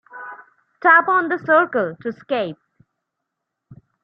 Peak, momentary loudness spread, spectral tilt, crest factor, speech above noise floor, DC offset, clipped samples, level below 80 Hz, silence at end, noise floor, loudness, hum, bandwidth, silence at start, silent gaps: -2 dBFS; 21 LU; -8 dB/octave; 20 dB; 62 dB; under 0.1%; under 0.1%; -70 dBFS; 0.3 s; -80 dBFS; -17 LUFS; none; 5.6 kHz; 0.15 s; none